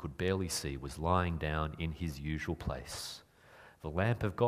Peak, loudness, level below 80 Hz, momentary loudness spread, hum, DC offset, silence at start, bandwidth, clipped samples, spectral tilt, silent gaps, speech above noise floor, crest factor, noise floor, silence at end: -14 dBFS; -36 LUFS; -48 dBFS; 10 LU; none; under 0.1%; 0 s; 15.5 kHz; under 0.1%; -5.5 dB/octave; none; 24 dB; 22 dB; -59 dBFS; 0 s